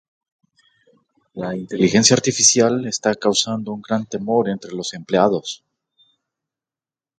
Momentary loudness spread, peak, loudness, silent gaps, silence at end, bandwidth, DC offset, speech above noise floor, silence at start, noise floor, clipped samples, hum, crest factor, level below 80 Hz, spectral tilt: 15 LU; 0 dBFS; -18 LUFS; none; 1.65 s; 9.4 kHz; under 0.1%; over 71 dB; 1.35 s; under -90 dBFS; under 0.1%; none; 20 dB; -58 dBFS; -3 dB/octave